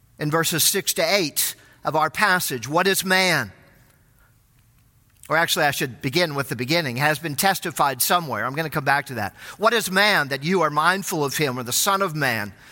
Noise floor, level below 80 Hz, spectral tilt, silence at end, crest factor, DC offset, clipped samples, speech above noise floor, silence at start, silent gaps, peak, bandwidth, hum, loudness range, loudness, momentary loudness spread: -57 dBFS; -60 dBFS; -3 dB/octave; 0 s; 20 dB; under 0.1%; under 0.1%; 36 dB; 0.2 s; none; -2 dBFS; 17 kHz; none; 3 LU; -21 LUFS; 7 LU